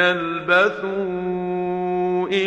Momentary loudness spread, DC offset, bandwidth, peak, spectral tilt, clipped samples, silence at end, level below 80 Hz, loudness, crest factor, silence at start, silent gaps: 8 LU; under 0.1%; 8.2 kHz; -4 dBFS; -6 dB/octave; under 0.1%; 0 s; -56 dBFS; -21 LUFS; 18 dB; 0 s; none